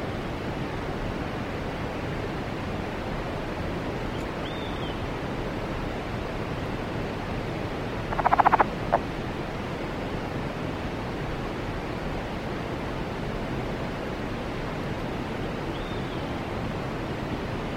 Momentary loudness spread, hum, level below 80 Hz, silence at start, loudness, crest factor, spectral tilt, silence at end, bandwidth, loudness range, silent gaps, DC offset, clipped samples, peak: 5 LU; none; -40 dBFS; 0 s; -30 LUFS; 26 dB; -6.5 dB/octave; 0 s; 16 kHz; 5 LU; none; under 0.1%; under 0.1%; -4 dBFS